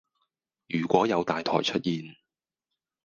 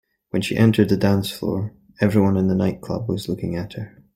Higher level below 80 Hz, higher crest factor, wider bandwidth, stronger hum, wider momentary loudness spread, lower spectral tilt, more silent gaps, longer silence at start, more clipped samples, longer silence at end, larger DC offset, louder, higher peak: second, -66 dBFS vs -50 dBFS; first, 24 dB vs 18 dB; second, 7.4 kHz vs 16 kHz; neither; about the same, 10 LU vs 11 LU; second, -5.5 dB/octave vs -7 dB/octave; neither; first, 0.7 s vs 0.35 s; neither; first, 0.9 s vs 0.25 s; neither; second, -27 LUFS vs -21 LUFS; second, -6 dBFS vs -2 dBFS